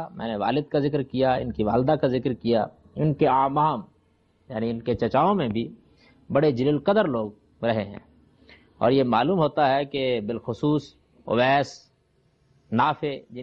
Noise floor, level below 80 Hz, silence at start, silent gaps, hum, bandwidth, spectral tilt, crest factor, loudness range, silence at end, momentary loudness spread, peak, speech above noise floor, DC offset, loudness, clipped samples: -65 dBFS; -54 dBFS; 0 s; none; none; 7.6 kHz; -8 dB/octave; 18 dB; 2 LU; 0 s; 10 LU; -8 dBFS; 42 dB; under 0.1%; -24 LUFS; under 0.1%